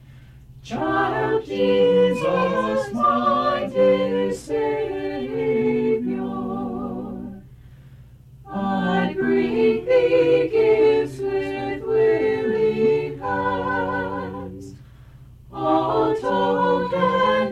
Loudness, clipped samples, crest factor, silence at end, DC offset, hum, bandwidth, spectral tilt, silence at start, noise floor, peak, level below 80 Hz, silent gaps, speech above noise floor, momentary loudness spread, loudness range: -21 LUFS; under 0.1%; 14 dB; 0 s; under 0.1%; none; 11 kHz; -7 dB/octave; 0.1 s; -45 dBFS; -8 dBFS; -50 dBFS; none; 25 dB; 11 LU; 6 LU